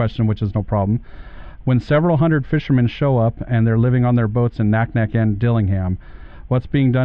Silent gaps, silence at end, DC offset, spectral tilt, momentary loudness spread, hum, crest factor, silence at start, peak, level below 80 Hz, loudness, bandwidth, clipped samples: none; 0 s; under 0.1%; -10.5 dB/octave; 6 LU; none; 12 dB; 0 s; -6 dBFS; -36 dBFS; -18 LUFS; 5.2 kHz; under 0.1%